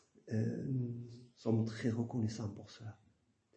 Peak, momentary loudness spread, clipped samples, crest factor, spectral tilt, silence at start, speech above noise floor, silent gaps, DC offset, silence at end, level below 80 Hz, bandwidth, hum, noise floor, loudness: -22 dBFS; 16 LU; under 0.1%; 18 dB; -7.5 dB/octave; 0.25 s; 36 dB; none; under 0.1%; 0.6 s; -74 dBFS; 8.4 kHz; none; -74 dBFS; -39 LUFS